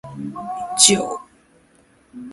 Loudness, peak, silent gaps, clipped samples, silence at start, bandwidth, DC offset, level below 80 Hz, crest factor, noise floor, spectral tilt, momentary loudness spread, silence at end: -16 LUFS; 0 dBFS; none; under 0.1%; 0.05 s; 16 kHz; under 0.1%; -60 dBFS; 22 dB; -55 dBFS; -1.5 dB/octave; 20 LU; 0 s